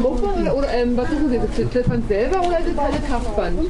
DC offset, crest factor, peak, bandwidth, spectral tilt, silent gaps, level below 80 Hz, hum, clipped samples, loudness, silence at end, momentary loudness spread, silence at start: under 0.1%; 12 dB; -6 dBFS; 11 kHz; -7 dB/octave; none; -26 dBFS; none; under 0.1%; -21 LUFS; 0 s; 3 LU; 0 s